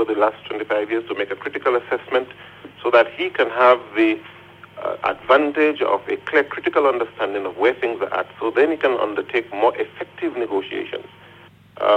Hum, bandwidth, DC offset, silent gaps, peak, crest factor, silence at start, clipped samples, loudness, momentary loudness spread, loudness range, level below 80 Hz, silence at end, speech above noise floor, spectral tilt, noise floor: none; 9 kHz; under 0.1%; none; -2 dBFS; 18 dB; 0 s; under 0.1%; -20 LUFS; 12 LU; 3 LU; -64 dBFS; 0 s; 27 dB; -6 dB/octave; -47 dBFS